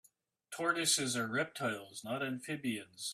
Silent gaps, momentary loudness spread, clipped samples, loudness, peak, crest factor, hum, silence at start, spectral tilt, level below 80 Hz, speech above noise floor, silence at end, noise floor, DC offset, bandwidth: none; 11 LU; under 0.1%; -35 LUFS; -16 dBFS; 20 dB; none; 0.5 s; -2.5 dB/octave; -80 dBFS; 24 dB; 0 s; -61 dBFS; under 0.1%; 15.5 kHz